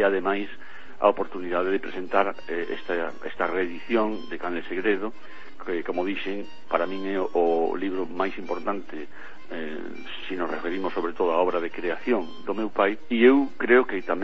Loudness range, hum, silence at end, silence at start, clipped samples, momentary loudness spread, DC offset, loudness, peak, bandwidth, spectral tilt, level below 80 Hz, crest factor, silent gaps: 5 LU; none; 0 s; 0 s; under 0.1%; 16 LU; 3%; -26 LUFS; -4 dBFS; 6.4 kHz; -6.5 dB/octave; -62 dBFS; 22 dB; none